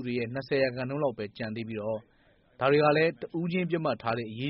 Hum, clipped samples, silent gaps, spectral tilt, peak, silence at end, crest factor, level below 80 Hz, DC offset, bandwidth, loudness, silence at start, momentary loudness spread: none; under 0.1%; none; -5 dB/octave; -12 dBFS; 0 s; 18 dB; -66 dBFS; under 0.1%; 5.6 kHz; -29 LUFS; 0 s; 12 LU